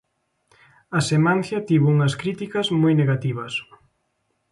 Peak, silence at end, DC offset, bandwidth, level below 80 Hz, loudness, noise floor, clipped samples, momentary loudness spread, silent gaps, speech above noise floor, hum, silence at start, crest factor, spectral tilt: -8 dBFS; 0.9 s; under 0.1%; 11.5 kHz; -62 dBFS; -21 LUFS; -72 dBFS; under 0.1%; 9 LU; none; 52 dB; none; 0.9 s; 14 dB; -6.5 dB/octave